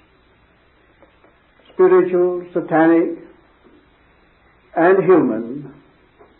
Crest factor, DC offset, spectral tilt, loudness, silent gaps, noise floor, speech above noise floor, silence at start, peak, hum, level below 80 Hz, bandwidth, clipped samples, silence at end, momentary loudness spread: 16 dB; under 0.1%; -12.5 dB/octave; -16 LUFS; none; -54 dBFS; 40 dB; 1.8 s; -2 dBFS; none; -62 dBFS; 4 kHz; under 0.1%; 0.7 s; 17 LU